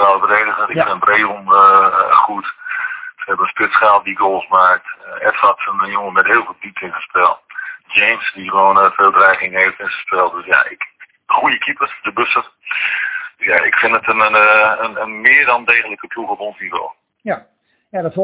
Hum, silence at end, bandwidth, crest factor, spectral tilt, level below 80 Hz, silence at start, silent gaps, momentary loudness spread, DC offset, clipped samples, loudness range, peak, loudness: none; 0 s; 4 kHz; 14 dB; -6.5 dB/octave; -58 dBFS; 0 s; none; 15 LU; under 0.1%; 0.1%; 4 LU; 0 dBFS; -13 LUFS